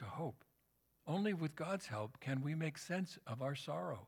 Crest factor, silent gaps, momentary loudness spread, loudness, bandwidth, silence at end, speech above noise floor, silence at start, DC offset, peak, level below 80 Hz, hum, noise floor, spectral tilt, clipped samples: 16 dB; none; 6 LU; -43 LUFS; 18 kHz; 0 s; 37 dB; 0 s; under 0.1%; -26 dBFS; -80 dBFS; none; -79 dBFS; -6.5 dB/octave; under 0.1%